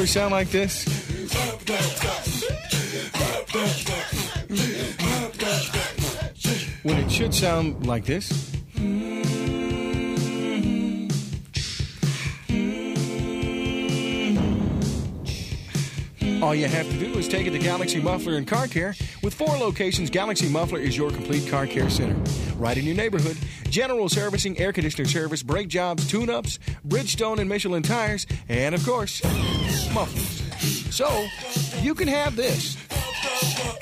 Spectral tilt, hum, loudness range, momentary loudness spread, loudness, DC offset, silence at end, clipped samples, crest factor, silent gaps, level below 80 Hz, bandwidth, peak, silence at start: -4.5 dB/octave; none; 2 LU; 5 LU; -25 LUFS; under 0.1%; 0 s; under 0.1%; 18 dB; none; -38 dBFS; 15.5 kHz; -8 dBFS; 0 s